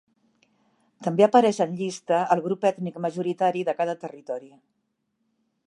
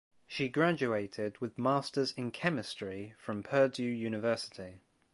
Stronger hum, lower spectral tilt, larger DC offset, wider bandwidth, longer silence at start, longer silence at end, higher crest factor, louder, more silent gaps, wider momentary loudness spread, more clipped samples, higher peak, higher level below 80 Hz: neither; about the same, -6 dB/octave vs -6 dB/octave; neither; about the same, 11.5 kHz vs 11.5 kHz; first, 1 s vs 0.3 s; first, 1.2 s vs 0.35 s; about the same, 22 dB vs 22 dB; first, -24 LUFS vs -34 LUFS; neither; first, 16 LU vs 13 LU; neither; first, -4 dBFS vs -12 dBFS; second, -80 dBFS vs -70 dBFS